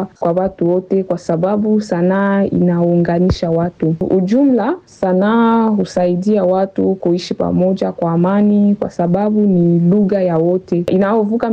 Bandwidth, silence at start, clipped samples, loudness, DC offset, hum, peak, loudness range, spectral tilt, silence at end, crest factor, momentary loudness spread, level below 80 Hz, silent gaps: 8 kHz; 0 s; under 0.1%; -14 LUFS; under 0.1%; none; -6 dBFS; 1 LU; -8.5 dB/octave; 0 s; 8 dB; 5 LU; -42 dBFS; none